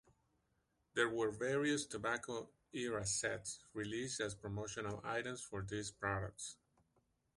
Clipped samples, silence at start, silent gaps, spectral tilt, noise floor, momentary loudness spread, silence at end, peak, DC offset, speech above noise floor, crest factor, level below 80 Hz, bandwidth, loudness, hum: under 0.1%; 0.95 s; none; -3.5 dB/octave; -82 dBFS; 10 LU; 0.85 s; -20 dBFS; under 0.1%; 40 dB; 22 dB; -66 dBFS; 11.5 kHz; -41 LUFS; none